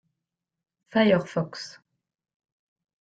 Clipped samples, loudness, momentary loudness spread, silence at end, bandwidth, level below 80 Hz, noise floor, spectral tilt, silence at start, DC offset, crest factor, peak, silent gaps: under 0.1%; -25 LUFS; 18 LU; 1.45 s; 8 kHz; -68 dBFS; -86 dBFS; -6.5 dB/octave; 0.95 s; under 0.1%; 20 dB; -8 dBFS; none